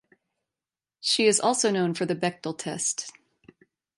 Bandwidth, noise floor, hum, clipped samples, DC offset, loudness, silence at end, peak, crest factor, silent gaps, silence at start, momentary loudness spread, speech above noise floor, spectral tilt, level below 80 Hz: 11.5 kHz; under -90 dBFS; none; under 0.1%; under 0.1%; -25 LUFS; 0.9 s; -10 dBFS; 18 dB; none; 1.05 s; 12 LU; over 65 dB; -3 dB/octave; -74 dBFS